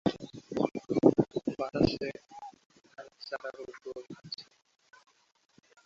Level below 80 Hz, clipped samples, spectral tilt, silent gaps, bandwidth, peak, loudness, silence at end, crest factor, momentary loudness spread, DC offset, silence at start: -58 dBFS; under 0.1%; -7 dB/octave; 2.66-2.70 s; 7.6 kHz; -6 dBFS; -32 LUFS; 1.45 s; 26 dB; 23 LU; under 0.1%; 0.05 s